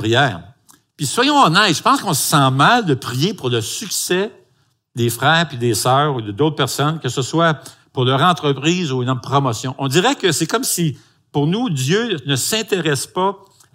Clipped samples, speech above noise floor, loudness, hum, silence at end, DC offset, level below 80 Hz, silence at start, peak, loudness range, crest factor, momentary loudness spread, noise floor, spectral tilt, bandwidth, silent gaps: under 0.1%; 45 dB; -17 LUFS; none; 0.4 s; under 0.1%; -60 dBFS; 0 s; 0 dBFS; 3 LU; 18 dB; 9 LU; -61 dBFS; -4 dB/octave; 16 kHz; none